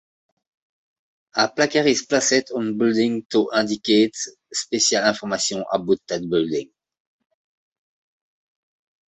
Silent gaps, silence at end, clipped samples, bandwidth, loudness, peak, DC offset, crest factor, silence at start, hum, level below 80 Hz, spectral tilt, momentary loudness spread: 3.25-3.29 s; 2.45 s; under 0.1%; 8.4 kHz; -21 LUFS; -2 dBFS; under 0.1%; 20 dB; 1.35 s; none; -64 dBFS; -3 dB/octave; 8 LU